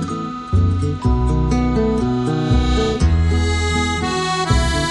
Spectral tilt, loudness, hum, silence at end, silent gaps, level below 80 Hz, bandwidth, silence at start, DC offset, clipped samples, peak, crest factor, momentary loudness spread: -6 dB/octave; -18 LUFS; none; 0 s; none; -22 dBFS; 11 kHz; 0 s; under 0.1%; under 0.1%; -2 dBFS; 14 dB; 3 LU